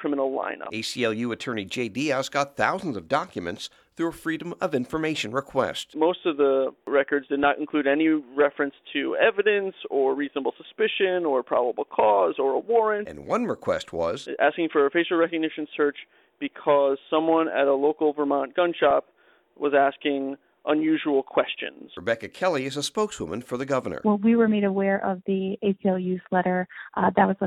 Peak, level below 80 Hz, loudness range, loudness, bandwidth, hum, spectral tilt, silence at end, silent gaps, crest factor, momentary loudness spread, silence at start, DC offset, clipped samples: -4 dBFS; -64 dBFS; 4 LU; -25 LUFS; 13.5 kHz; none; -5.5 dB/octave; 0 s; none; 20 dB; 9 LU; 0 s; under 0.1%; under 0.1%